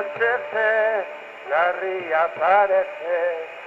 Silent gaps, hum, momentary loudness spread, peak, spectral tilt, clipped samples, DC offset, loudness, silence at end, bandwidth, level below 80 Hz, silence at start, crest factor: none; none; 9 LU; -6 dBFS; -4.5 dB/octave; under 0.1%; under 0.1%; -21 LUFS; 0 s; 7.6 kHz; -72 dBFS; 0 s; 16 dB